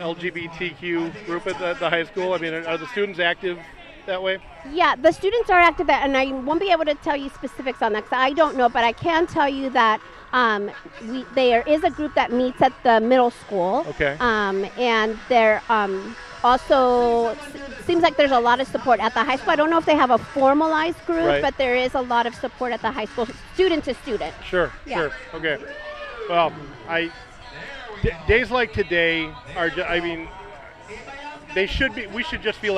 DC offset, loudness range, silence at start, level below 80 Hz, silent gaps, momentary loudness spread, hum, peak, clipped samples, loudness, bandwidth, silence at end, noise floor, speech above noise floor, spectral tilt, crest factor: under 0.1%; 6 LU; 0 s; -44 dBFS; none; 14 LU; none; -4 dBFS; under 0.1%; -21 LUFS; 12 kHz; 0 s; -40 dBFS; 19 dB; -5 dB/octave; 18 dB